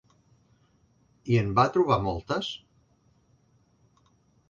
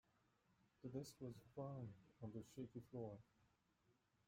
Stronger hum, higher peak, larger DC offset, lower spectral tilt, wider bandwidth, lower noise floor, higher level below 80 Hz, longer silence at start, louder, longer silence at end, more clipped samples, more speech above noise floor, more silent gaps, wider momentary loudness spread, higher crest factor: neither; first, -8 dBFS vs -38 dBFS; neither; about the same, -7 dB/octave vs -7.5 dB/octave; second, 7.4 kHz vs 16 kHz; second, -65 dBFS vs -83 dBFS; first, -52 dBFS vs -82 dBFS; first, 1.25 s vs 0.8 s; first, -26 LUFS vs -56 LUFS; first, 1.95 s vs 0.35 s; neither; first, 40 dB vs 28 dB; neither; first, 16 LU vs 6 LU; about the same, 22 dB vs 18 dB